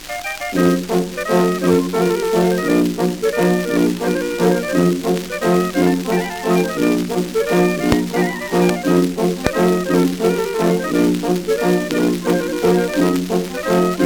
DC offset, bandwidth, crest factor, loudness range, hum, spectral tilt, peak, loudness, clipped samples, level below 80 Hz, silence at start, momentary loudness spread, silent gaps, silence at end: under 0.1%; over 20 kHz; 16 dB; 1 LU; none; -6 dB/octave; 0 dBFS; -17 LUFS; under 0.1%; -42 dBFS; 0 s; 4 LU; none; 0 s